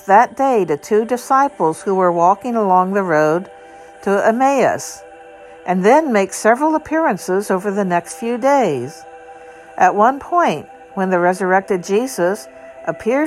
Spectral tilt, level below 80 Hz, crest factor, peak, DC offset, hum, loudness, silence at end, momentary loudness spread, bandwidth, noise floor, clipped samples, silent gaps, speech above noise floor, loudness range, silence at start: -5.5 dB/octave; -58 dBFS; 16 dB; 0 dBFS; under 0.1%; none; -16 LUFS; 0 s; 14 LU; 15 kHz; -39 dBFS; under 0.1%; none; 23 dB; 2 LU; 0.05 s